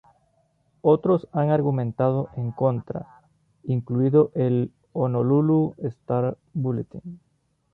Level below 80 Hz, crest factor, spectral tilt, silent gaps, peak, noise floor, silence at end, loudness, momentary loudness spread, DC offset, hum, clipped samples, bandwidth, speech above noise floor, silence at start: -60 dBFS; 18 dB; -12 dB/octave; none; -6 dBFS; -66 dBFS; 0.6 s; -23 LUFS; 13 LU; under 0.1%; none; under 0.1%; 4.1 kHz; 44 dB; 0.85 s